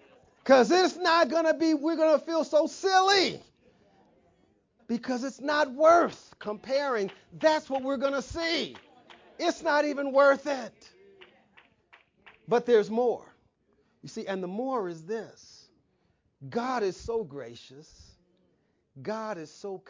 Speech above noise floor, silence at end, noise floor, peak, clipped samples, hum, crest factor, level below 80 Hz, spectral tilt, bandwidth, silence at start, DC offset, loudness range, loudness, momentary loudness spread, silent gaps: 45 dB; 0.1 s; -71 dBFS; -8 dBFS; under 0.1%; none; 20 dB; -64 dBFS; -4 dB/octave; 7.6 kHz; 0.45 s; under 0.1%; 11 LU; -27 LUFS; 16 LU; none